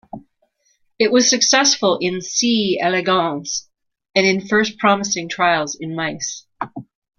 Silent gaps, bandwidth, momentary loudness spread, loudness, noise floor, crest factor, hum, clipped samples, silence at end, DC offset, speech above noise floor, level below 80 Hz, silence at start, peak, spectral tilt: none; 11 kHz; 13 LU; -17 LUFS; -64 dBFS; 18 dB; none; under 0.1%; 0.35 s; under 0.1%; 46 dB; -60 dBFS; 0.15 s; 0 dBFS; -2.5 dB/octave